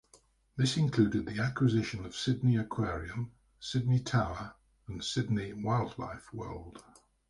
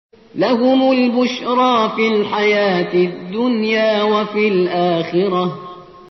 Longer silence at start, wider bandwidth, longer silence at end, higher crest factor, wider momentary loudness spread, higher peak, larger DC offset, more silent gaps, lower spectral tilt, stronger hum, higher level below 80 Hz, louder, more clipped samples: first, 0.55 s vs 0.35 s; first, 11.5 kHz vs 6.2 kHz; first, 0.5 s vs 0.1 s; first, 18 dB vs 12 dB; first, 15 LU vs 7 LU; second, -14 dBFS vs -4 dBFS; neither; neither; first, -6 dB/octave vs -3.5 dB/octave; neither; first, -54 dBFS vs -60 dBFS; second, -32 LUFS vs -16 LUFS; neither